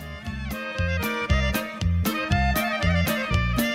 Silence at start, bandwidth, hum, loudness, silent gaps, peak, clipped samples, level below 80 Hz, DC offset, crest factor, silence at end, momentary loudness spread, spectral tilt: 0 s; 16 kHz; none; -25 LUFS; none; -8 dBFS; under 0.1%; -30 dBFS; under 0.1%; 16 dB; 0 s; 8 LU; -5.5 dB/octave